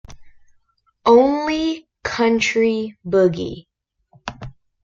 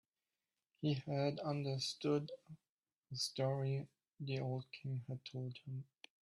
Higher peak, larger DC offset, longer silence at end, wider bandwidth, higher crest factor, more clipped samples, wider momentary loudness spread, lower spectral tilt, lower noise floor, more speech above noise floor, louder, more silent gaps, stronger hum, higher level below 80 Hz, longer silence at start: first, -2 dBFS vs -24 dBFS; neither; about the same, 0.3 s vs 0.4 s; second, 7.6 kHz vs 12.5 kHz; about the same, 18 dB vs 18 dB; neither; first, 21 LU vs 13 LU; about the same, -5 dB/octave vs -6 dB/octave; second, -62 dBFS vs under -90 dBFS; second, 45 dB vs over 49 dB; first, -18 LUFS vs -42 LUFS; second, none vs 2.69-2.83 s, 2.96-3.02 s; neither; first, -50 dBFS vs -80 dBFS; second, 0.1 s vs 0.8 s